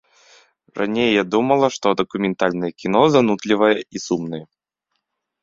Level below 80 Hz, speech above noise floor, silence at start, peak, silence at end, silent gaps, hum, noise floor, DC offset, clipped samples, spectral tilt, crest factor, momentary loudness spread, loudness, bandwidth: -60 dBFS; 58 dB; 0.75 s; -2 dBFS; 1 s; none; none; -76 dBFS; under 0.1%; under 0.1%; -5.5 dB/octave; 18 dB; 10 LU; -19 LUFS; 7.8 kHz